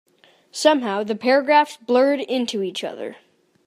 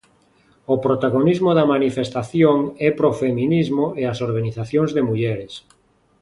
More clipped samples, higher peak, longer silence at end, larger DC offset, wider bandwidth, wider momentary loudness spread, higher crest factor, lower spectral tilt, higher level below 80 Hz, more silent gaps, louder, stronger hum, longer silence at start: neither; about the same, -2 dBFS vs -2 dBFS; second, 0.5 s vs 0.65 s; neither; first, 15 kHz vs 11.5 kHz; first, 15 LU vs 8 LU; about the same, 20 dB vs 18 dB; second, -3.5 dB/octave vs -8 dB/octave; second, -80 dBFS vs -54 dBFS; neither; about the same, -20 LUFS vs -19 LUFS; neither; second, 0.55 s vs 0.7 s